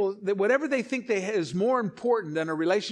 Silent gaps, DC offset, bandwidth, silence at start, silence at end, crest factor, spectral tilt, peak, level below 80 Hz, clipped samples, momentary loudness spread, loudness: none; under 0.1%; 10.5 kHz; 0 s; 0 s; 14 dB; -5.5 dB/octave; -12 dBFS; -74 dBFS; under 0.1%; 4 LU; -27 LUFS